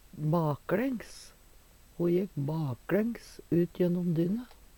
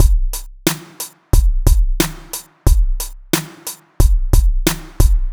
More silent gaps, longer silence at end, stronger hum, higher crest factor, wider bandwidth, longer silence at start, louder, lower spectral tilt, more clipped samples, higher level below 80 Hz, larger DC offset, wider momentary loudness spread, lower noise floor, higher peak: neither; first, 0.3 s vs 0 s; neither; about the same, 16 dB vs 14 dB; about the same, 19 kHz vs over 20 kHz; first, 0.15 s vs 0 s; second, -31 LUFS vs -19 LUFS; first, -8 dB/octave vs -4.5 dB/octave; neither; second, -58 dBFS vs -16 dBFS; neither; second, 8 LU vs 13 LU; first, -57 dBFS vs -33 dBFS; second, -16 dBFS vs 0 dBFS